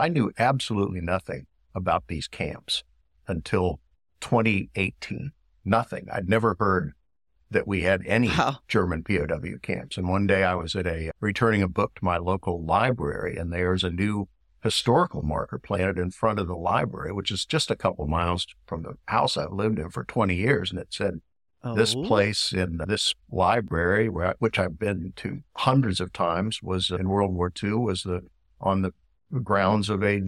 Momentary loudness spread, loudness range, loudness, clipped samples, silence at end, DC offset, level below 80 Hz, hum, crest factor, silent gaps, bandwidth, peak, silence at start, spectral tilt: 10 LU; 3 LU; -26 LUFS; under 0.1%; 0 s; under 0.1%; -46 dBFS; none; 18 dB; none; 13 kHz; -8 dBFS; 0 s; -5.5 dB/octave